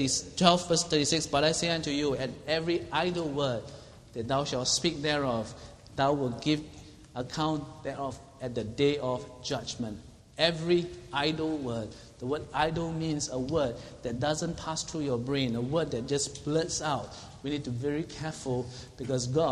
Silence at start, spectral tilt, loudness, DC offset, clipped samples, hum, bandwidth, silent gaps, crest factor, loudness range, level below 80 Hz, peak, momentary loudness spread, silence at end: 0 s; -4 dB/octave; -30 LUFS; under 0.1%; under 0.1%; none; 12.5 kHz; none; 28 dB; 4 LU; -54 dBFS; -4 dBFS; 13 LU; 0 s